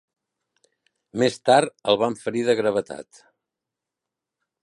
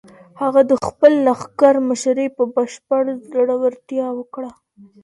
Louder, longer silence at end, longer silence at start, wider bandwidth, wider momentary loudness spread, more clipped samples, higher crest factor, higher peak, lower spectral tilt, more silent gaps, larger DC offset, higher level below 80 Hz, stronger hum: second, -22 LUFS vs -17 LUFS; first, 1.6 s vs 0.5 s; first, 1.15 s vs 0.35 s; about the same, 11.5 kHz vs 11.5 kHz; first, 16 LU vs 11 LU; neither; about the same, 22 dB vs 18 dB; second, -4 dBFS vs 0 dBFS; about the same, -4.5 dB/octave vs -5 dB/octave; neither; neither; second, -68 dBFS vs -58 dBFS; neither